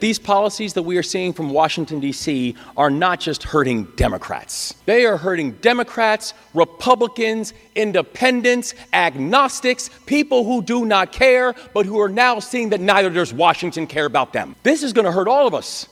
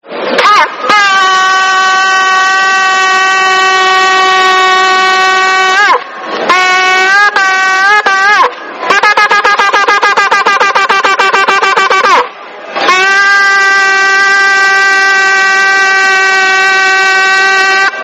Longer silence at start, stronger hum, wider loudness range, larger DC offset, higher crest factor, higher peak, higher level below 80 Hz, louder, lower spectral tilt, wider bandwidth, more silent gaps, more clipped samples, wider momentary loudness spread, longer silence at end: about the same, 0 s vs 0.05 s; neither; about the same, 3 LU vs 1 LU; neither; first, 18 dB vs 8 dB; about the same, 0 dBFS vs 0 dBFS; first, -42 dBFS vs -60 dBFS; second, -18 LUFS vs -6 LUFS; first, -4 dB/octave vs 0 dB/octave; about the same, 15 kHz vs 16.5 kHz; neither; second, under 0.1% vs 2%; first, 8 LU vs 3 LU; about the same, 0.05 s vs 0 s